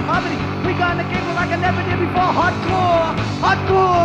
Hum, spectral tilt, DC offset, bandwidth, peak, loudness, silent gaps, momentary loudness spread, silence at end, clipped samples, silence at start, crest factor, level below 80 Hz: none; -6.5 dB/octave; under 0.1%; 9 kHz; -6 dBFS; -18 LUFS; none; 5 LU; 0 s; under 0.1%; 0 s; 12 dB; -38 dBFS